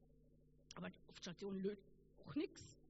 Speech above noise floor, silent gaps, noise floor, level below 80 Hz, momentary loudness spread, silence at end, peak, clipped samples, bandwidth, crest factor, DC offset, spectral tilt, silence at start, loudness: 22 dB; none; -71 dBFS; -74 dBFS; 12 LU; 0 s; -32 dBFS; under 0.1%; 7.6 kHz; 18 dB; under 0.1%; -5.5 dB/octave; 0 s; -50 LUFS